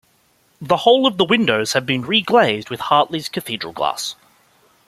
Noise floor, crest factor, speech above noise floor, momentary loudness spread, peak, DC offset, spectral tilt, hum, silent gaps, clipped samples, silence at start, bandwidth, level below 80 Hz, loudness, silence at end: -59 dBFS; 18 dB; 42 dB; 11 LU; 0 dBFS; under 0.1%; -4 dB/octave; none; none; under 0.1%; 0.6 s; 15.5 kHz; -60 dBFS; -17 LUFS; 0.75 s